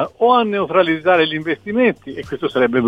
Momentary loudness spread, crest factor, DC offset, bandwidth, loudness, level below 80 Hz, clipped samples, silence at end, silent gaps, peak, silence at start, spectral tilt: 9 LU; 14 dB; under 0.1%; 7.8 kHz; -16 LUFS; -54 dBFS; under 0.1%; 0 s; none; -2 dBFS; 0 s; -7 dB/octave